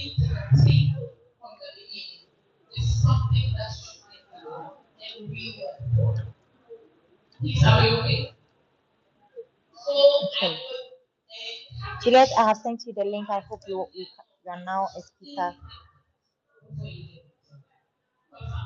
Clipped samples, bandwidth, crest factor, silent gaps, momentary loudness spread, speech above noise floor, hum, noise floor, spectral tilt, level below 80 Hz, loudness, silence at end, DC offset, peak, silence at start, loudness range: under 0.1%; 7.2 kHz; 22 dB; none; 24 LU; 51 dB; none; -75 dBFS; -6.5 dB/octave; -44 dBFS; -23 LUFS; 0 s; under 0.1%; -4 dBFS; 0 s; 12 LU